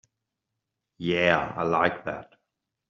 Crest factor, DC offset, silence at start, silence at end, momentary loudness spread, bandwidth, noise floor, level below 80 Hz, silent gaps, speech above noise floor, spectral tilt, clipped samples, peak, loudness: 24 dB; under 0.1%; 1 s; 0.65 s; 13 LU; 7.4 kHz; -84 dBFS; -60 dBFS; none; 58 dB; -3 dB/octave; under 0.1%; -4 dBFS; -25 LUFS